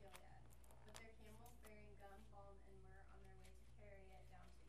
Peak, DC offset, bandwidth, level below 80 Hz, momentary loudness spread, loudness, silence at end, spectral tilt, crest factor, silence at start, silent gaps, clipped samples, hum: -34 dBFS; under 0.1%; 13 kHz; -68 dBFS; 5 LU; -65 LUFS; 0 s; -4.5 dB/octave; 30 dB; 0 s; none; under 0.1%; none